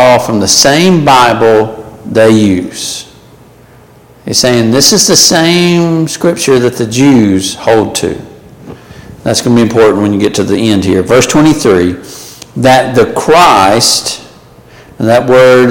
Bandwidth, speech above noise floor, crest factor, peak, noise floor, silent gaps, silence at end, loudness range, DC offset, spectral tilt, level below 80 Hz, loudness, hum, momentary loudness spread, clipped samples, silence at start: over 20 kHz; 31 dB; 8 dB; 0 dBFS; -38 dBFS; none; 0 s; 4 LU; under 0.1%; -4 dB/octave; -40 dBFS; -7 LUFS; none; 13 LU; 0.4%; 0 s